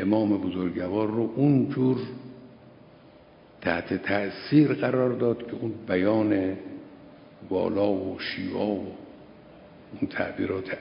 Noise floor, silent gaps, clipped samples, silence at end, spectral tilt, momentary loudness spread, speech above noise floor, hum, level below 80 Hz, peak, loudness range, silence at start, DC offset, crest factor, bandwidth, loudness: -52 dBFS; none; under 0.1%; 0 s; -11.5 dB/octave; 16 LU; 27 dB; none; -58 dBFS; -8 dBFS; 5 LU; 0 s; under 0.1%; 20 dB; 5.4 kHz; -26 LUFS